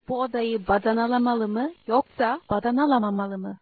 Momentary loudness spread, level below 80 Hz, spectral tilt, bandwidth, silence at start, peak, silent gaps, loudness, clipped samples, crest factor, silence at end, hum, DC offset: 6 LU; -52 dBFS; -9.5 dB/octave; 4.8 kHz; 0.1 s; -8 dBFS; none; -24 LUFS; under 0.1%; 16 dB; 0.05 s; none; under 0.1%